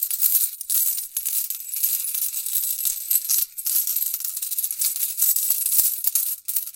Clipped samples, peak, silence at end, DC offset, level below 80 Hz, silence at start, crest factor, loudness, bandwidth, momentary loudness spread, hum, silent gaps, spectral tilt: under 0.1%; 0 dBFS; 0.05 s; under 0.1%; -72 dBFS; 0 s; 22 dB; -20 LUFS; 17.5 kHz; 6 LU; none; none; 4.5 dB/octave